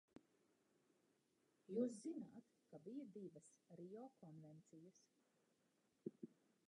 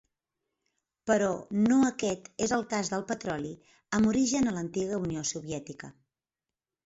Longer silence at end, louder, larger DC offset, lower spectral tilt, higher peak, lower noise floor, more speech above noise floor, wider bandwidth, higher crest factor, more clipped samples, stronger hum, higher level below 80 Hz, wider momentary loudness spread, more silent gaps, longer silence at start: second, 0.35 s vs 0.95 s; second, -54 LUFS vs -29 LUFS; neither; first, -7 dB/octave vs -4.5 dB/octave; second, -32 dBFS vs -14 dBFS; second, -84 dBFS vs under -90 dBFS; second, 31 dB vs over 61 dB; first, 10.5 kHz vs 8 kHz; first, 24 dB vs 18 dB; neither; neither; second, under -90 dBFS vs -60 dBFS; first, 20 LU vs 15 LU; neither; second, 0.15 s vs 1.05 s